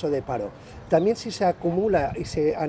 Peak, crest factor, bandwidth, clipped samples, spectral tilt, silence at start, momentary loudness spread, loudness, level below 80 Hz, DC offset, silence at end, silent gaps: -8 dBFS; 16 dB; 8 kHz; under 0.1%; -6.5 dB/octave; 0 s; 9 LU; -24 LUFS; -46 dBFS; under 0.1%; 0 s; none